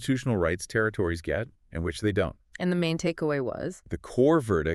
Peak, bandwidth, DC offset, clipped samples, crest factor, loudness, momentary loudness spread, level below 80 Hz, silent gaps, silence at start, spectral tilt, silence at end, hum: -10 dBFS; 13 kHz; under 0.1%; under 0.1%; 16 dB; -28 LUFS; 11 LU; -46 dBFS; none; 0 s; -6 dB/octave; 0 s; none